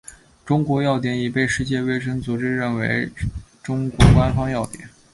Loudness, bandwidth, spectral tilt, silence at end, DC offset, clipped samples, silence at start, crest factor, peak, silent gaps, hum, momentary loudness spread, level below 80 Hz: -21 LUFS; 11.5 kHz; -6.5 dB/octave; 0.25 s; under 0.1%; under 0.1%; 0.1 s; 20 dB; 0 dBFS; none; none; 14 LU; -32 dBFS